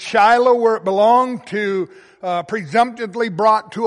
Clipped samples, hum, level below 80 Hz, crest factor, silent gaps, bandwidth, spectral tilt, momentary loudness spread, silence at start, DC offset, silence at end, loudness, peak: under 0.1%; none; -64 dBFS; 14 dB; none; 11 kHz; -5 dB/octave; 11 LU; 0 s; under 0.1%; 0 s; -16 LUFS; -2 dBFS